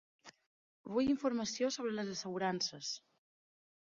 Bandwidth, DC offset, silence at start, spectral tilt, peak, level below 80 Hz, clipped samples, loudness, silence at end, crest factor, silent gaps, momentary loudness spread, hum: 7.4 kHz; under 0.1%; 0.25 s; -3.5 dB/octave; -22 dBFS; -74 dBFS; under 0.1%; -37 LUFS; 1 s; 18 dB; 0.46-0.84 s; 9 LU; none